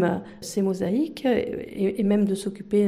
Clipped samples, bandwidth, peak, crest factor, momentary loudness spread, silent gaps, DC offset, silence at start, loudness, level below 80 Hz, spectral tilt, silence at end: under 0.1%; 14.5 kHz; -10 dBFS; 14 dB; 8 LU; none; under 0.1%; 0 s; -25 LUFS; -56 dBFS; -6.5 dB/octave; 0 s